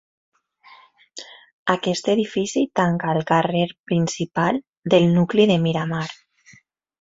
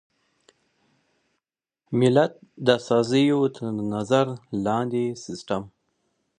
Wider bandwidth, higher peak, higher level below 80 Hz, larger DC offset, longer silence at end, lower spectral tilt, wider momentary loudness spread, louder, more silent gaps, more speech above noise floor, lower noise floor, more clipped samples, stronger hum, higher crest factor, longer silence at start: second, 8 kHz vs 10 kHz; about the same, -2 dBFS vs -4 dBFS; about the same, -60 dBFS vs -64 dBFS; neither; first, 0.85 s vs 0.7 s; about the same, -6 dB/octave vs -6.5 dB/octave; about the same, 11 LU vs 10 LU; about the same, -21 LUFS vs -23 LUFS; first, 1.53-1.66 s, 3.79-3.84 s, 4.69-4.82 s vs none; second, 35 dB vs 62 dB; second, -55 dBFS vs -85 dBFS; neither; neither; about the same, 20 dB vs 22 dB; second, 1.15 s vs 1.9 s